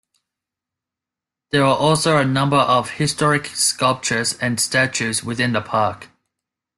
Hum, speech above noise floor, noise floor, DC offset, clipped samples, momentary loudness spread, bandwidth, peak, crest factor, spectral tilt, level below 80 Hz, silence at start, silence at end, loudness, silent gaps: none; 68 dB; -87 dBFS; under 0.1%; under 0.1%; 6 LU; 12.5 kHz; -4 dBFS; 16 dB; -3.5 dB/octave; -56 dBFS; 1.55 s; 0.75 s; -18 LUFS; none